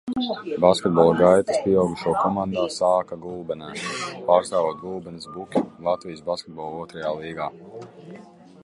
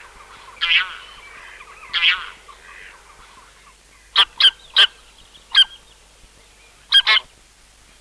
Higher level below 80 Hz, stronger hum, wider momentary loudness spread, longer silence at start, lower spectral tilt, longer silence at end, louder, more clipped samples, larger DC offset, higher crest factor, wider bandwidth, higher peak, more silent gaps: about the same, -56 dBFS vs -54 dBFS; neither; second, 16 LU vs 26 LU; second, 0.05 s vs 0.6 s; first, -5.5 dB/octave vs 2 dB/octave; second, 0 s vs 0.8 s; second, -23 LUFS vs -15 LUFS; neither; neither; about the same, 20 dB vs 18 dB; second, 11.5 kHz vs 13.5 kHz; about the same, -2 dBFS vs -2 dBFS; neither